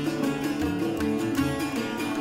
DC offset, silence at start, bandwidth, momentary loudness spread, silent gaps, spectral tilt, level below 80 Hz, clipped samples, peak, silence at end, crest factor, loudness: under 0.1%; 0 s; 16 kHz; 3 LU; none; -5.5 dB/octave; -50 dBFS; under 0.1%; -14 dBFS; 0 s; 14 dB; -27 LUFS